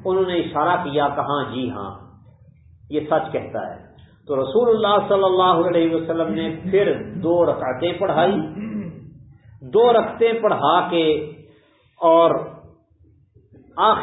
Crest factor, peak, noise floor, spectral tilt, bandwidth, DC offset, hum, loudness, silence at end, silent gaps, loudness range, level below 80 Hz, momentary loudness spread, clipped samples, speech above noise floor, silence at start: 18 dB; -2 dBFS; -55 dBFS; -11 dB/octave; 4 kHz; under 0.1%; none; -19 LUFS; 0 s; none; 6 LU; -54 dBFS; 13 LU; under 0.1%; 36 dB; 0 s